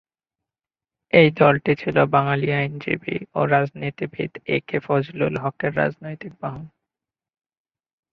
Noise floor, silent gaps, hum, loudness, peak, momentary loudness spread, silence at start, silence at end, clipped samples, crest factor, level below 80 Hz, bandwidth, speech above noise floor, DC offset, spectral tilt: under -90 dBFS; none; none; -21 LUFS; -2 dBFS; 16 LU; 1.15 s; 1.45 s; under 0.1%; 22 dB; -58 dBFS; 5.8 kHz; over 69 dB; under 0.1%; -9 dB/octave